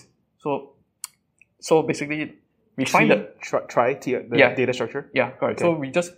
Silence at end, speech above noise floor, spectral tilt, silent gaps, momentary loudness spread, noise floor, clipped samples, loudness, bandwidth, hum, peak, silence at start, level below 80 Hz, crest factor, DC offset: 0.05 s; 40 dB; -5 dB/octave; none; 19 LU; -62 dBFS; under 0.1%; -22 LUFS; 16 kHz; none; 0 dBFS; 0.45 s; -68 dBFS; 22 dB; under 0.1%